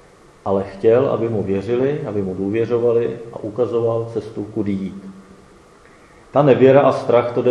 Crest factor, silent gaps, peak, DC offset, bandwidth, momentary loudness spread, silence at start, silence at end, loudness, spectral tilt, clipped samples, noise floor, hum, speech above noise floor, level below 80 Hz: 18 dB; none; 0 dBFS; under 0.1%; 10 kHz; 15 LU; 0.45 s; 0 s; -18 LUFS; -8.5 dB/octave; under 0.1%; -47 dBFS; none; 30 dB; -56 dBFS